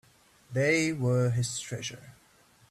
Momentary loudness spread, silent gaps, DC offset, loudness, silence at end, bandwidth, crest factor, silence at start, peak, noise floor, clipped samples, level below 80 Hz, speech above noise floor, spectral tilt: 12 LU; none; under 0.1%; -29 LUFS; 0.6 s; 13.5 kHz; 18 dB; 0.5 s; -12 dBFS; -56 dBFS; under 0.1%; -62 dBFS; 28 dB; -5 dB/octave